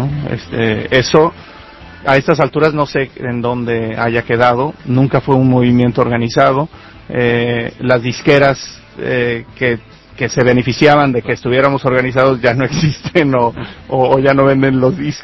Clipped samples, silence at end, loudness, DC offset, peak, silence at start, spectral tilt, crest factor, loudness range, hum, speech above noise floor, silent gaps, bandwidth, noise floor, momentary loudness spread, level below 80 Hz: 0.2%; 0 s; -13 LUFS; under 0.1%; 0 dBFS; 0 s; -6.5 dB/octave; 14 dB; 2 LU; none; 22 dB; none; 8 kHz; -35 dBFS; 8 LU; -40 dBFS